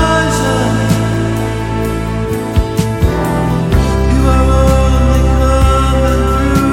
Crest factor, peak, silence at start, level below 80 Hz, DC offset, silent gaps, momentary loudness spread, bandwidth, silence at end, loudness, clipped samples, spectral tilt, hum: 10 dB; 0 dBFS; 0 s; -16 dBFS; under 0.1%; none; 6 LU; 16 kHz; 0 s; -13 LUFS; under 0.1%; -6.5 dB/octave; none